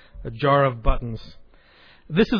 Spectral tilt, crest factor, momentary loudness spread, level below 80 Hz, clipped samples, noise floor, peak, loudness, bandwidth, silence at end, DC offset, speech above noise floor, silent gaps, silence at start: -8.5 dB/octave; 18 dB; 17 LU; -30 dBFS; under 0.1%; -52 dBFS; -6 dBFS; -23 LUFS; 5.4 kHz; 0 s; under 0.1%; 31 dB; none; 0.15 s